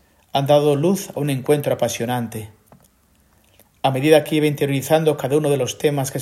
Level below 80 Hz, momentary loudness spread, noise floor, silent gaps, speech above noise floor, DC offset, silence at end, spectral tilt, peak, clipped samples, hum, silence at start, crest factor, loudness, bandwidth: -58 dBFS; 8 LU; -58 dBFS; none; 40 dB; under 0.1%; 0 s; -5.5 dB/octave; 0 dBFS; under 0.1%; none; 0.35 s; 20 dB; -19 LUFS; 16.5 kHz